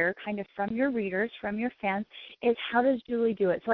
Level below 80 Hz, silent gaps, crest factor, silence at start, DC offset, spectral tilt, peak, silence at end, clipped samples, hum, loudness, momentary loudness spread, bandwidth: -66 dBFS; none; 18 dB; 0 s; under 0.1%; -9 dB/octave; -12 dBFS; 0 s; under 0.1%; none; -29 LUFS; 8 LU; 5.4 kHz